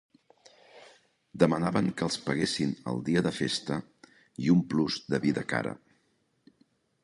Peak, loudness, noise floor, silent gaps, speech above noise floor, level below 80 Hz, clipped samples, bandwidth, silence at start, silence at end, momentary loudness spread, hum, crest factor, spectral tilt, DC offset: -8 dBFS; -29 LUFS; -72 dBFS; none; 44 dB; -62 dBFS; under 0.1%; 11.5 kHz; 0.75 s; 1.3 s; 11 LU; none; 22 dB; -5.5 dB/octave; under 0.1%